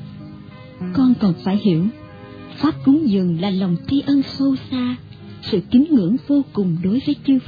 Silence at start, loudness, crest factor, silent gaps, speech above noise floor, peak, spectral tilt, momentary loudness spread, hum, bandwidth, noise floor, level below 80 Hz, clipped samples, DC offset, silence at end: 0 s; -18 LUFS; 14 dB; none; 20 dB; -4 dBFS; -9.5 dB/octave; 21 LU; none; 5 kHz; -38 dBFS; -52 dBFS; under 0.1%; under 0.1%; 0.05 s